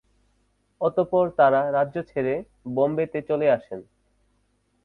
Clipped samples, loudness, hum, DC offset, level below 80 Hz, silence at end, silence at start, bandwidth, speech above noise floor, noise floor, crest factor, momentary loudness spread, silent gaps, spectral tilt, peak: under 0.1%; -23 LUFS; 50 Hz at -60 dBFS; under 0.1%; -62 dBFS; 1.05 s; 0.8 s; 4.4 kHz; 45 dB; -68 dBFS; 18 dB; 11 LU; none; -9 dB/octave; -6 dBFS